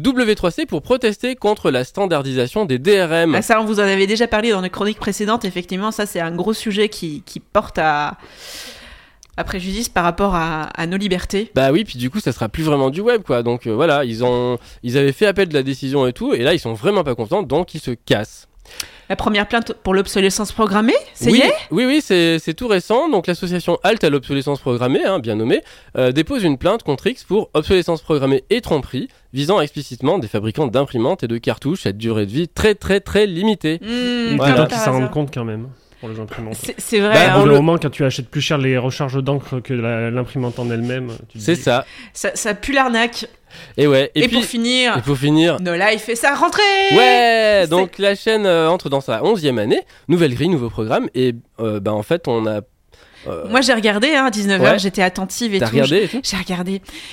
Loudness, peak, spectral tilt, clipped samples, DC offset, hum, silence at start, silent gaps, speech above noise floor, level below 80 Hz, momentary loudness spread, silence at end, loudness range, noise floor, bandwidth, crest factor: -17 LUFS; 0 dBFS; -5 dB/octave; under 0.1%; under 0.1%; none; 0 s; none; 31 dB; -42 dBFS; 10 LU; 0 s; 6 LU; -48 dBFS; 16.5 kHz; 16 dB